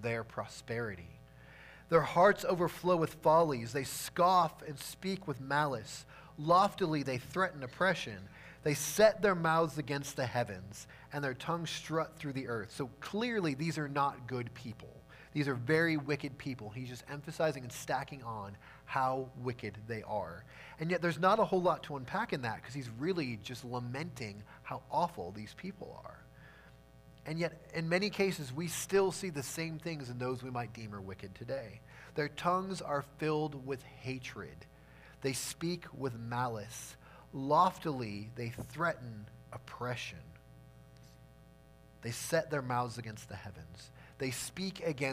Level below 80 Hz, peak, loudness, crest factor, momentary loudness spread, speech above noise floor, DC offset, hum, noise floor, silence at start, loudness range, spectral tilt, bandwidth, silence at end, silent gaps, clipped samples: -64 dBFS; -12 dBFS; -35 LUFS; 22 dB; 19 LU; 24 dB; under 0.1%; none; -59 dBFS; 0 s; 9 LU; -5 dB/octave; 15.5 kHz; 0 s; none; under 0.1%